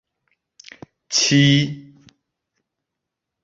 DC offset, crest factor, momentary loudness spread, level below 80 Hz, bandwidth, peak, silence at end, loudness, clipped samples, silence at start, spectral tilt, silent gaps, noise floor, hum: under 0.1%; 18 dB; 14 LU; -60 dBFS; 8 kHz; -4 dBFS; 1.65 s; -16 LUFS; under 0.1%; 1.1 s; -4 dB/octave; none; -82 dBFS; none